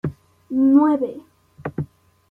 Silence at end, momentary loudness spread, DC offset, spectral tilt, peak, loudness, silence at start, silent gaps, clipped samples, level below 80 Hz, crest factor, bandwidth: 0.45 s; 20 LU; under 0.1%; -10.5 dB/octave; -4 dBFS; -19 LUFS; 0.05 s; none; under 0.1%; -56 dBFS; 16 dB; 3.4 kHz